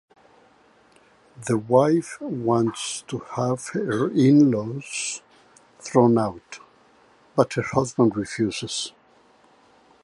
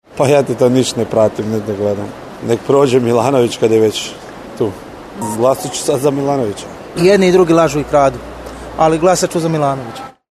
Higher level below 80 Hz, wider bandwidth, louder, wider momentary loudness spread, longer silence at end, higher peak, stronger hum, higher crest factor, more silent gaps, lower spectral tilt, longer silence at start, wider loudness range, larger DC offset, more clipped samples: second, -60 dBFS vs -42 dBFS; second, 11.5 kHz vs 13.5 kHz; second, -23 LUFS vs -14 LUFS; second, 14 LU vs 17 LU; first, 1.15 s vs 0.25 s; about the same, -2 dBFS vs 0 dBFS; neither; first, 22 dB vs 14 dB; neither; about the same, -5.5 dB/octave vs -5.5 dB/octave; first, 1.4 s vs 0.1 s; about the same, 4 LU vs 3 LU; neither; neither